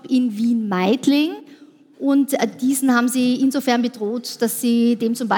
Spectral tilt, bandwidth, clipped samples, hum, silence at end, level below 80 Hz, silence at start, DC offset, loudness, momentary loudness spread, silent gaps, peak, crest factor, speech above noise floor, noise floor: -4.5 dB/octave; 17.5 kHz; under 0.1%; none; 0 s; -80 dBFS; 0.05 s; under 0.1%; -19 LUFS; 7 LU; none; -4 dBFS; 16 dB; 28 dB; -46 dBFS